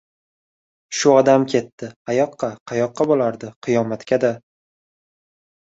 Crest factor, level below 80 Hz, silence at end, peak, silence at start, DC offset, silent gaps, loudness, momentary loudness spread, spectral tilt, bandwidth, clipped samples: 18 dB; -62 dBFS; 1.2 s; -2 dBFS; 0.9 s; under 0.1%; 1.72-1.78 s, 1.96-2.05 s, 2.60-2.66 s, 3.56-3.62 s; -19 LUFS; 14 LU; -5 dB/octave; 8 kHz; under 0.1%